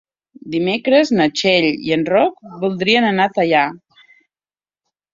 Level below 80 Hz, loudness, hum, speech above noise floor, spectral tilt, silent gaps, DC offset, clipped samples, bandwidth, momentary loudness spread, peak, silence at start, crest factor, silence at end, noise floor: -60 dBFS; -16 LUFS; none; over 74 dB; -5 dB/octave; none; under 0.1%; under 0.1%; 7.6 kHz; 8 LU; -2 dBFS; 0.45 s; 16 dB; 1.35 s; under -90 dBFS